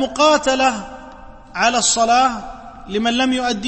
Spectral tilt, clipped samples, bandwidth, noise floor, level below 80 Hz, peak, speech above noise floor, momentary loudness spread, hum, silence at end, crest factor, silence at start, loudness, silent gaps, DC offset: -2 dB/octave; under 0.1%; 8.8 kHz; -38 dBFS; -44 dBFS; -2 dBFS; 21 dB; 21 LU; none; 0 s; 16 dB; 0 s; -16 LUFS; none; under 0.1%